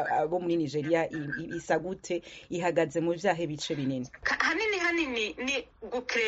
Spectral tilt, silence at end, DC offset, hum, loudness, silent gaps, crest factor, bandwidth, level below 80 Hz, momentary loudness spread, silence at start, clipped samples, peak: -3 dB/octave; 0 s; under 0.1%; none; -30 LUFS; none; 20 dB; 8 kHz; -60 dBFS; 9 LU; 0 s; under 0.1%; -10 dBFS